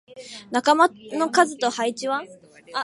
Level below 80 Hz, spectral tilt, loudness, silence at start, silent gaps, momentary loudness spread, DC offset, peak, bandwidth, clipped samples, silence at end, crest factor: -74 dBFS; -2.5 dB/octave; -22 LUFS; 0.15 s; none; 13 LU; under 0.1%; -4 dBFS; 11.5 kHz; under 0.1%; 0 s; 20 dB